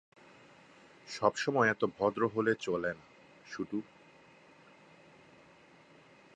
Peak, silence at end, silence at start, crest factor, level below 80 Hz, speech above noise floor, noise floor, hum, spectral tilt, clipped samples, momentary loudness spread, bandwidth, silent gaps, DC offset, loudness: -12 dBFS; 2.55 s; 1.05 s; 24 dB; -72 dBFS; 28 dB; -60 dBFS; none; -5 dB/octave; under 0.1%; 19 LU; 10 kHz; none; under 0.1%; -33 LUFS